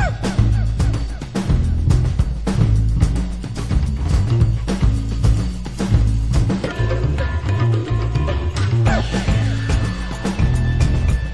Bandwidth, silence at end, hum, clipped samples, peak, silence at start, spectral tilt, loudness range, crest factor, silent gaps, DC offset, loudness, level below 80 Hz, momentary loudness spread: 11 kHz; 0 s; none; under 0.1%; -2 dBFS; 0 s; -7 dB/octave; 1 LU; 14 dB; none; under 0.1%; -19 LUFS; -22 dBFS; 5 LU